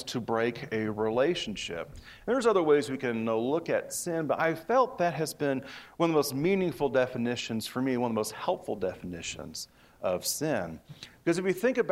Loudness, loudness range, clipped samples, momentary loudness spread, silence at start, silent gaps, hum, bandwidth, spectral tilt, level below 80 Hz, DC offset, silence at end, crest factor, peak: -30 LUFS; 5 LU; under 0.1%; 11 LU; 0 s; none; none; 16 kHz; -4.5 dB/octave; -62 dBFS; under 0.1%; 0 s; 18 dB; -12 dBFS